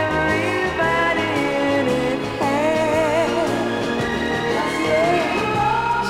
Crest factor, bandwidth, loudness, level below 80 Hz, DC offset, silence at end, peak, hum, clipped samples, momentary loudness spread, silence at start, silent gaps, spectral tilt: 12 dB; 16.5 kHz; -19 LUFS; -44 dBFS; under 0.1%; 0 s; -6 dBFS; none; under 0.1%; 4 LU; 0 s; none; -5 dB/octave